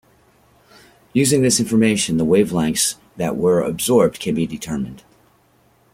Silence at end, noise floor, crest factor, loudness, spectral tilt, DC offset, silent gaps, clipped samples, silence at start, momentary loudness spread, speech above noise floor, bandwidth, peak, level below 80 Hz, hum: 0.95 s; -57 dBFS; 18 dB; -18 LUFS; -4.5 dB/octave; under 0.1%; none; under 0.1%; 1.15 s; 10 LU; 39 dB; 16.5 kHz; -2 dBFS; -50 dBFS; none